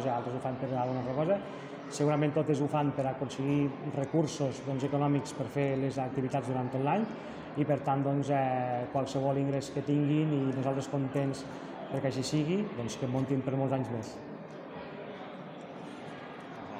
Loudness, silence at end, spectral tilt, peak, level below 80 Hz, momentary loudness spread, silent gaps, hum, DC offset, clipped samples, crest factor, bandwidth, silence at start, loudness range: -32 LUFS; 0 s; -7 dB/octave; -14 dBFS; -66 dBFS; 14 LU; none; none; under 0.1%; under 0.1%; 18 dB; 10.5 kHz; 0 s; 4 LU